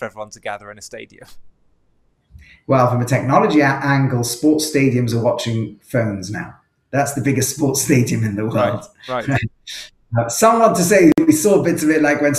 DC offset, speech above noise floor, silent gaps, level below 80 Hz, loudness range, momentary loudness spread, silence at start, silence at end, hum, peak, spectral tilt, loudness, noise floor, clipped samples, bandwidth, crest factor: under 0.1%; 43 dB; none; -50 dBFS; 4 LU; 17 LU; 0 s; 0 s; none; 0 dBFS; -5.5 dB/octave; -16 LUFS; -60 dBFS; under 0.1%; 16 kHz; 16 dB